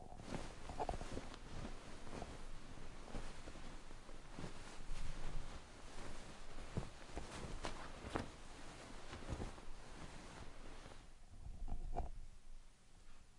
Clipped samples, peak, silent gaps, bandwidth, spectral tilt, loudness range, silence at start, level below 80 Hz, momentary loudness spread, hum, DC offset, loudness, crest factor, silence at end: under 0.1%; -22 dBFS; none; 11.5 kHz; -5 dB/octave; 4 LU; 0 s; -50 dBFS; 11 LU; none; under 0.1%; -53 LUFS; 24 dB; 0 s